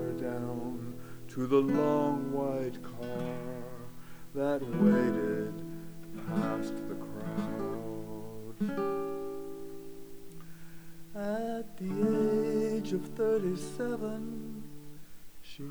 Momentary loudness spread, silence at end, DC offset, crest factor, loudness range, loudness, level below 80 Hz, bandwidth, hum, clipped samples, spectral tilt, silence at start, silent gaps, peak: 21 LU; 0 s; under 0.1%; 20 dB; 6 LU; -33 LUFS; -62 dBFS; over 20 kHz; none; under 0.1%; -7.5 dB/octave; 0 s; none; -14 dBFS